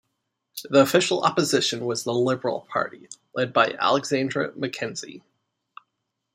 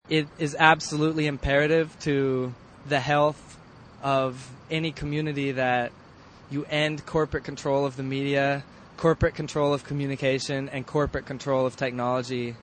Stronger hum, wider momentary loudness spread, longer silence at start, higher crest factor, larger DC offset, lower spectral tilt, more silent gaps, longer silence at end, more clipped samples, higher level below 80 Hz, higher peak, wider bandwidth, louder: neither; first, 15 LU vs 9 LU; first, 0.55 s vs 0.05 s; about the same, 20 dB vs 24 dB; neither; second, -4 dB/octave vs -5.5 dB/octave; neither; first, 1.15 s vs 0.05 s; neither; second, -72 dBFS vs -48 dBFS; about the same, -4 dBFS vs -2 dBFS; first, 15.5 kHz vs 9.4 kHz; first, -23 LUFS vs -26 LUFS